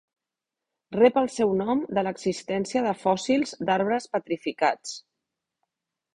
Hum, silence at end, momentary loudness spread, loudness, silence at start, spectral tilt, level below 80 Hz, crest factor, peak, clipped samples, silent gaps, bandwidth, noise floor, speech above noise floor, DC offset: none; 1.15 s; 10 LU; -25 LUFS; 0.9 s; -5 dB/octave; -66 dBFS; 20 dB; -6 dBFS; under 0.1%; none; 10.5 kHz; -88 dBFS; 63 dB; under 0.1%